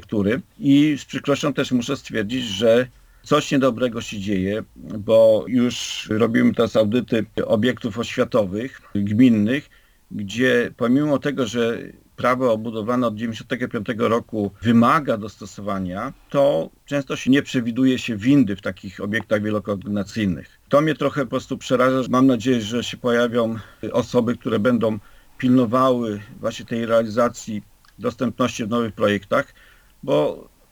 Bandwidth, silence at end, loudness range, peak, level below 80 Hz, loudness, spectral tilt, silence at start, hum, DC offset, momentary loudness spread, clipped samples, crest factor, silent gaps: 19.5 kHz; 0.3 s; 3 LU; -4 dBFS; -54 dBFS; -21 LUFS; -6 dB/octave; 0 s; none; under 0.1%; 11 LU; under 0.1%; 16 dB; none